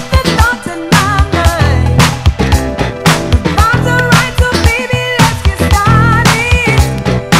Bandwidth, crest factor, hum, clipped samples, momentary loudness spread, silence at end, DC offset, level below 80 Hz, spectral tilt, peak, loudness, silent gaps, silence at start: 16.5 kHz; 10 dB; none; 0.9%; 5 LU; 0 s; under 0.1%; -16 dBFS; -5 dB/octave; 0 dBFS; -10 LUFS; none; 0 s